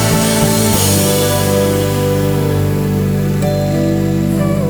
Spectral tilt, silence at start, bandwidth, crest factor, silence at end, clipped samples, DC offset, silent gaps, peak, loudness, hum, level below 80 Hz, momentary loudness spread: -5 dB/octave; 0 s; over 20 kHz; 12 dB; 0 s; under 0.1%; under 0.1%; none; 0 dBFS; -13 LUFS; 50 Hz at -40 dBFS; -32 dBFS; 4 LU